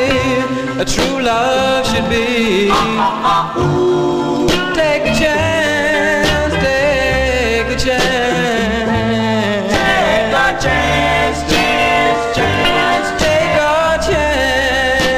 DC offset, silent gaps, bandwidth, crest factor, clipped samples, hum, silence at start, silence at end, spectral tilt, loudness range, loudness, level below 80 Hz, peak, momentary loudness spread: 0.2%; none; 16 kHz; 14 dB; under 0.1%; none; 0 s; 0 s; -4.5 dB/octave; 1 LU; -13 LUFS; -30 dBFS; 0 dBFS; 3 LU